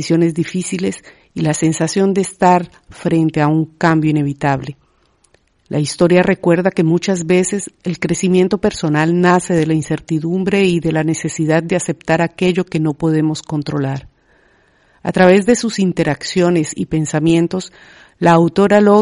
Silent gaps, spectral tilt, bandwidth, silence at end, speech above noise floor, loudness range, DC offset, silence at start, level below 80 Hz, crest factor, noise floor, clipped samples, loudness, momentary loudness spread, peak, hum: none; -6 dB/octave; 11 kHz; 0 s; 42 dB; 3 LU; under 0.1%; 0 s; -48 dBFS; 14 dB; -57 dBFS; under 0.1%; -15 LUFS; 9 LU; 0 dBFS; none